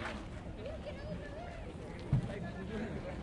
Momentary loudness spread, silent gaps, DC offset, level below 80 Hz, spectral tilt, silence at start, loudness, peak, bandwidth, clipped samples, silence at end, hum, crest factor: 10 LU; none; under 0.1%; -50 dBFS; -7.5 dB/octave; 0 s; -42 LUFS; -20 dBFS; 11 kHz; under 0.1%; 0 s; none; 20 dB